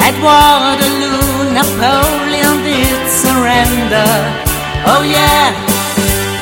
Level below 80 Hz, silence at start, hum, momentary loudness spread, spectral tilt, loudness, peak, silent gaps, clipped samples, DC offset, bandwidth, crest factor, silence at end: -26 dBFS; 0 s; none; 6 LU; -3.5 dB/octave; -10 LUFS; 0 dBFS; none; 0.3%; under 0.1%; 17.5 kHz; 10 dB; 0 s